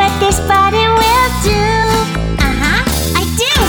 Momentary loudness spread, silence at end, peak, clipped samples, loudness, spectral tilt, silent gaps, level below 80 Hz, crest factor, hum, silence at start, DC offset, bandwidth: 5 LU; 0 s; -2 dBFS; under 0.1%; -12 LUFS; -4 dB/octave; none; -20 dBFS; 10 dB; none; 0 s; under 0.1%; over 20 kHz